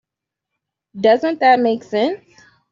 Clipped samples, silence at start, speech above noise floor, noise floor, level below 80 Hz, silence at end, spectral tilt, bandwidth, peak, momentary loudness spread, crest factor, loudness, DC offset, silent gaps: under 0.1%; 0.95 s; 68 dB; -83 dBFS; -68 dBFS; 0.55 s; -5.5 dB/octave; 7.4 kHz; -2 dBFS; 8 LU; 16 dB; -16 LUFS; under 0.1%; none